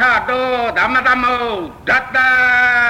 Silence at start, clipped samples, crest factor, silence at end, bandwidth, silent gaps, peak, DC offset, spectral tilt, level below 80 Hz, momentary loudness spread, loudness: 0 s; under 0.1%; 10 dB; 0 s; 16 kHz; none; -4 dBFS; under 0.1%; -4 dB/octave; -44 dBFS; 8 LU; -14 LUFS